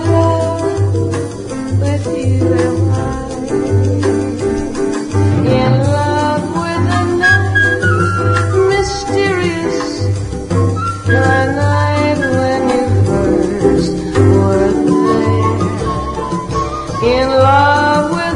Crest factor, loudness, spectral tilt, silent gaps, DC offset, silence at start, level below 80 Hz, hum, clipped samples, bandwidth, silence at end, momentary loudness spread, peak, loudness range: 12 dB; -14 LUFS; -6.5 dB/octave; none; under 0.1%; 0 s; -32 dBFS; none; under 0.1%; 10.5 kHz; 0 s; 8 LU; 0 dBFS; 3 LU